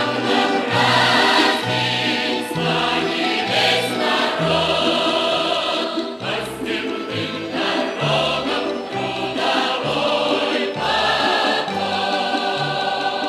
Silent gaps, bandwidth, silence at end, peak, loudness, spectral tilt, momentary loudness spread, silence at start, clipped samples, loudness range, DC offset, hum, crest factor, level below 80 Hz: none; 15 kHz; 0 s; -4 dBFS; -19 LUFS; -4 dB/octave; 8 LU; 0 s; under 0.1%; 4 LU; under 0.1%; none; 16 dB; -54 dBFS